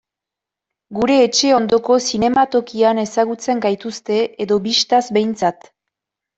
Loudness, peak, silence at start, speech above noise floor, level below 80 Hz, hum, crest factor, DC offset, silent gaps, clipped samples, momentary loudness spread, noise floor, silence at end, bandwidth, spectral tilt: -16 LUFS; -2 dBFS; 0.9 s; 69 dB; -54 dBFS; none; 16 dB; under 0.1%; none; under 0.1%; 7 LU; -85 dBFS; 0.85 s; 8.2 kHz; -3.5 dB/octave